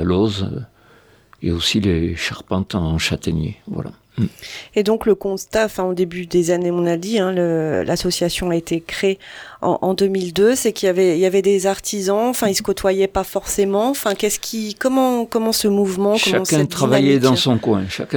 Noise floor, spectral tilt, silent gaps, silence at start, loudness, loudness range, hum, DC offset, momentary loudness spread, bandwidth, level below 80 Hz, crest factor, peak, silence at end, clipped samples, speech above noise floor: -50 dBFS; -4.5 dB/octave; none; 0 s; -18 LUFS; 5 LU; none; under 0.1%; 9 LU; over 20 kHz; -42 dBFS; 16 dB; -2 dBFS; 0 s; under 0.1%; 32 dB